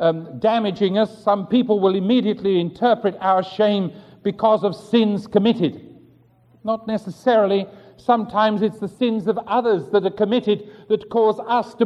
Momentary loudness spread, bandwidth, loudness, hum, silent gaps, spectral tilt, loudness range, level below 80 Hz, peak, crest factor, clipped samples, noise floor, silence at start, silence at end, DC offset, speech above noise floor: 7 LU; 10 kHz; -20 LUFS; none; none; -7.5 dB/octave; 2 LU; -62 dBFS; -4 dBFS; 16 dB; under 0.1%; -54 dBFS; 0 s; 0 s; under 0.1%; 35 dB